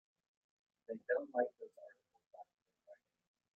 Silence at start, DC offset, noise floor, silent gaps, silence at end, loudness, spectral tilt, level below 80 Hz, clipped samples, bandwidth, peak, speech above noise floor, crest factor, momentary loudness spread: 0.9 s; under 0.1%; -66 dBFS; 2.26-2.31 s, 2.62-2.66 s; 0.6 s; -41 LUFS; -5 dB/octave; under -90 dBFS; under 0.1%; 2.9 kHz; -22 dBFS; 25 dB; 26 dB; 24 LU